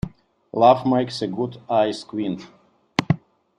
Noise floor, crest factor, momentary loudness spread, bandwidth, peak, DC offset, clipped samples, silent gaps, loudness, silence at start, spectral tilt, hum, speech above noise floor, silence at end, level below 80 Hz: -42 dBFS; 20 dB; 13 LU; 10.5 kHz; -2 dBFS; under 0.1%; under 0.1%; none; -22 LUFS; 0.05 s; -6.5 dB/octave; none; 21 dB; 0.45 s; -52 dBFS